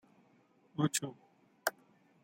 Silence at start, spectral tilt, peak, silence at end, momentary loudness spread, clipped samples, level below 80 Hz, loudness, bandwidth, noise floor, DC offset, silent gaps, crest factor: 0.8 s; -4 dB/octave; -14 dBFS; 0.55 s; 13 LU; under 0.1%; -86 dBFS; -37 LUFS; 16.5 kHz; -69 dBFS; under 0.1%; none; 26 dB